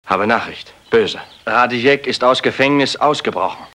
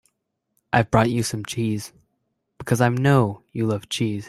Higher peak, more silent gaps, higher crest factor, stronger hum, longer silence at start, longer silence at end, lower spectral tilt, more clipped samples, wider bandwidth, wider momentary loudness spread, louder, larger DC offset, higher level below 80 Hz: about the same, 0 dBFS vs -2 dBFS; neither; about the same, 16 dB vs 20 dB; neither; second, 0.05 s vs 0.75 s; about the same, 0.1 s vs 0 s; second, -4.5 dB/octave vs -6 dB/octave; neither; second, 11.5 kHz vs 15.5 kHz; about the same, 8 LU vs 9 LU; first, -16 LUFS vs -22 LUFS; neither; second, -56 dBFS vs -50 dBFS